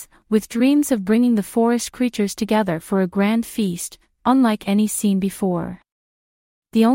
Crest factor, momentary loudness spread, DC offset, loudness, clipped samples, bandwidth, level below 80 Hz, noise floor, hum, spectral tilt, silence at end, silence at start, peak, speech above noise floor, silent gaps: 16 dB; 7 LU; under 0.1%; -20 LUFS; under 0.1%; 16.5 kHz; -54 dBFS; under -90 dBFS; none; -5.5 dB/octave; 0 s; 0 s; -4 dBFS; over 71 dB; 5.92-6.62 s